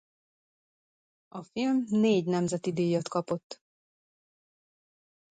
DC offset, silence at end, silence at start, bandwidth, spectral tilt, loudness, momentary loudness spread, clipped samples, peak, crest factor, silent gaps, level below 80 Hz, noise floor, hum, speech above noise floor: under 0.1%; 1.75 s; 1.35 s; 9.2 kHz; -6.5 dB/octave; -29 LUFS; 20 LU; under 0.1%; -16 dBFS; 16 dB; 3.44-3.50 s; -74 dBFS; under -90 dBFS; none; over 62 dB